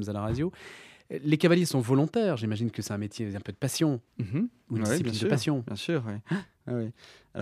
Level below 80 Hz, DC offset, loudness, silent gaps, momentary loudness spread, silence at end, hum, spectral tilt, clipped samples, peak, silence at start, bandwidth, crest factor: -60 dBFS; under 0.1%; -29 LUFS; none; 11 LU; 0 s; none; -6 dB/octave; under 0.1%; -8 dBFS; 0 s; 15.5 kHz; 20 dB